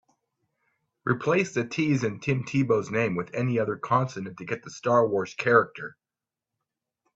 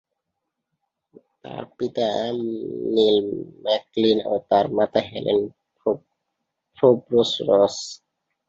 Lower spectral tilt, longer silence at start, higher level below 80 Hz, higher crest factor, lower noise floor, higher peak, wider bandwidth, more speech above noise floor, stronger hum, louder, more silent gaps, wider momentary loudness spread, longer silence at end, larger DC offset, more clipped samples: about the same, -6.5 dB/octave vs -5.5 dB/octave; second, 1.05 s vs 1.45 s; about the same, -66 dBFS vs -62 dBFS; about the same, 22 dB vs 20 dB; first, under -90 dBFS vs -81 dBFS; about the same, -4 dBFS vs -4 dBFS; about the same, 8 kHz vs 7.8 kHz; first, over 64 dB vs 59 dB; neither; second, -26 LUFS vs -22 LUFS; neither; about the same, 12 LU vs 13 LU; first, 1.25 s vs 0.55 s; neither; neither